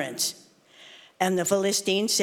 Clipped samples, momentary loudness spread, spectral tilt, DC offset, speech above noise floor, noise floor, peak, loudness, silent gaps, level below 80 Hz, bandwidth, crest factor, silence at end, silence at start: under 0.1%; 5 LU; -2.5 dB/octave; under 0.1%; 28 dB; -53 dBFS; -8 dBFS; -25 LUFS; none; -74 dBFS; 19 kHz; 20 dB; 0 s; 0 s